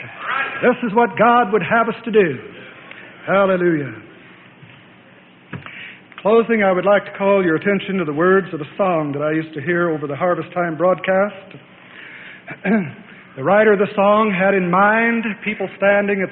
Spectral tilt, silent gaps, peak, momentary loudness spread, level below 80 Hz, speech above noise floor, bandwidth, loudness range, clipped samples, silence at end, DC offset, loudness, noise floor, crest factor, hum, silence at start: -11.5 dB/octave; none; -2 dBFS; 21 LU; -60 dBFS; 30 dB; 4.1 kHz; 6 LU; under 0.1%; 0 s; under 0.1%; -17 LUFS; -46 dBFS; 16 dB; none; 0 s